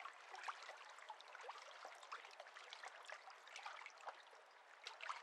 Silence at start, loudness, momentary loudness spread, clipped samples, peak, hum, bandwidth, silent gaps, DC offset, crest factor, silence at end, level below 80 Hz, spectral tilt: 0 s; -56 LUFS; 6 LU; under 0.1%; -32 dBFS; none; 13 kHz; none; under 0.1%; 24 dB; 0 s; under -90 dBFS; 3 dB/octave